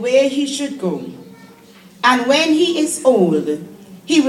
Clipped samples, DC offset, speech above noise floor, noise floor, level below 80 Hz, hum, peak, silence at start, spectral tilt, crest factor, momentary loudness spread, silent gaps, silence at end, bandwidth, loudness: under 0.1%; under 0.1%; 28 dB; -44 dBFS; -66 dBFS; none; 0 dBFS; 0 s; -4 dB/octave; 16 dB; 14 LU; none; 0 s; 14.5 kHz; -16 LUFS